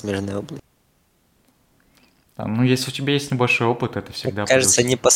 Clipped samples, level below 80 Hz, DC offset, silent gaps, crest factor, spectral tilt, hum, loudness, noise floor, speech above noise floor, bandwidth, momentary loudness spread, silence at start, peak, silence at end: under 0.1%; -56 dBFS; under 0.1%; none; 20 dB; -3.5 dB/octave; none; -20 LUFS; -63 dBFS; 43 dB; 16.5 kHz; 15 LU; 0.05 s; -2 dBFS; 0 s